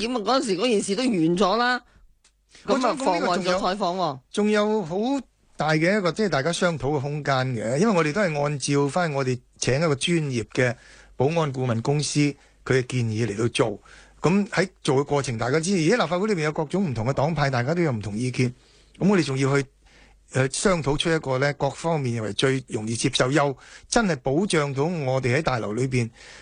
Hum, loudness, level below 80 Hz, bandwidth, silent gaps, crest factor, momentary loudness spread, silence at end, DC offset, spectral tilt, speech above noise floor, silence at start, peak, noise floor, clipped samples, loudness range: none; -24 LUFS; -50 dBFS; 10 kHz; none; 20 dB; 6 LU; 0 s; under 0.1%; -5 dB/octave; 35 dB; 0 s; -4 dBFS; -59 dBFS; under 0.1%; 1 LU